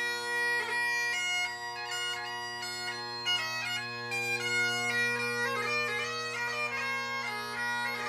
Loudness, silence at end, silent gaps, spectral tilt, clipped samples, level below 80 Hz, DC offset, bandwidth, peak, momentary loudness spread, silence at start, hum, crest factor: -31 LUFS; 0 s; none; -1.5 dB/octave; under 0.1%; -74 dBFS; under 0.1%; 15.5 kHz; -18 dBFS; 7 LU; 0 s; none; 14 dB